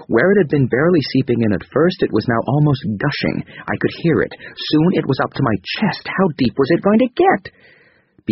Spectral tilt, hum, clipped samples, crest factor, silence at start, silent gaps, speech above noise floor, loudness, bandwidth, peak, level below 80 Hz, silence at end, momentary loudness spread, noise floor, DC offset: -5.5 dB/octave; none; under 0.1%; 14 dB; 0 s; none; 36 dB; -17 LUFS; 6 kHz; -2 dBFS; -48 dBFS; 0 s; 7 LU; -52 dBFS; under 0.1%